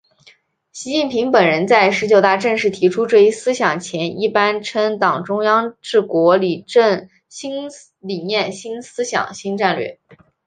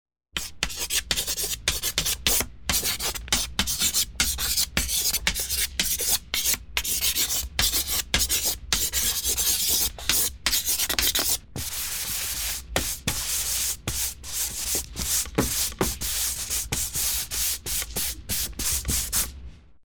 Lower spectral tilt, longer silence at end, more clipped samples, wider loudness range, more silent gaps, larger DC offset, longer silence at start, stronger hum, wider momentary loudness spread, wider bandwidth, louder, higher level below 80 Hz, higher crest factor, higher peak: first, -4.5 dB/octave vs -0.5 dB/octave; first, 0.55 s vs 0.25 s; neither; first, 6 LU vs 3 LU; neither; second, under 0.1% vs 0.2%; first, 0.75 s vs 0.35 s; neither; first, 15 LU vs 6 LU; second, 9.6 kHz vs over 20 kHz; first, -16 LUFS vs -24 LUFS; second, -64 dBFS vs -40 dBFS; second, 16 dB vs 22 dB; about the same, -2 dBFS vs -4 dBFS